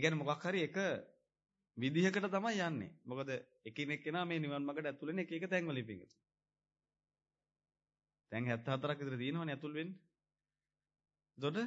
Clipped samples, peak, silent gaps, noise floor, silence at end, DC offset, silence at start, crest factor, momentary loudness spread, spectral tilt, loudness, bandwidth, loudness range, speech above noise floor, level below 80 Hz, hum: under 0.1%; -18 dBFS; none; under -90 dBFS; 0 s; under 0.1%; 0 s; 24 dB; 11 LU; -4.5 dB/octave; -40 LUFS; 7.6 kHz; 7 LU; over 51 dB; -86 dBFS; none